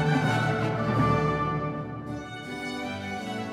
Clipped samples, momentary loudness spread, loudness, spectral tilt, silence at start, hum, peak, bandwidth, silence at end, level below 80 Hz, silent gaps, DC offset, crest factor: under 0.1%; 12 LU; -28 LUFS; -6.5 dB/octave; 0 s; none; -12 dBFS; 12.5 kHz; 0 s; -48 dBFS; none; under 0.1%; 16 dB